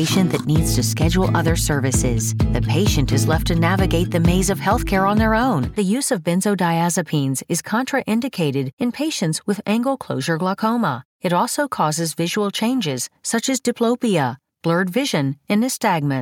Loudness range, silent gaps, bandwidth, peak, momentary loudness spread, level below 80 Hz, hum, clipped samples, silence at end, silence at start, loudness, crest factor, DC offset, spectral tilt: 3 LU; 8.73-8.77 s, 11.05-11.20 s; 18 kHz; -4 dBFS; 5 LU; -32 dBFS; none; under 0.1%; 0 s; 0 s; -19 LUFS; 14 dB; under 0.1%; -5 dB/octave